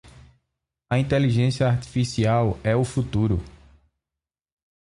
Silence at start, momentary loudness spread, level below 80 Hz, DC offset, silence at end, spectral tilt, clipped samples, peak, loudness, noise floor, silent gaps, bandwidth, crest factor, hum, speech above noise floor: 0.05 s; 4 LU; -42 dBFS; under 0.1%; 1.35 s; -7 dB/octave; under 0.1%; -8 dBFS; -23 LUFS; -89 dBFS; none; 11.5 kHz; 16 dB; none; 68 dB